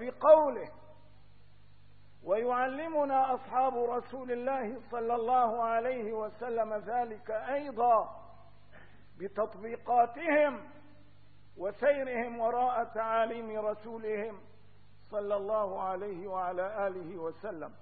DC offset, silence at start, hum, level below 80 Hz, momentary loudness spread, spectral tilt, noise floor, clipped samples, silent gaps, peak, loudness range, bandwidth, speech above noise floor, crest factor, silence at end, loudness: 0.3%; 0 s; 50 Hz at -65 dBFS; -68 dBFS; 12 LU; -9 dB/octave; -61 dBFS; under 0.1%; none; -10 dBFS; 5 LU; 4.7 kHz; 30 dB; 22 dB; 0.1 s; -32 LUFS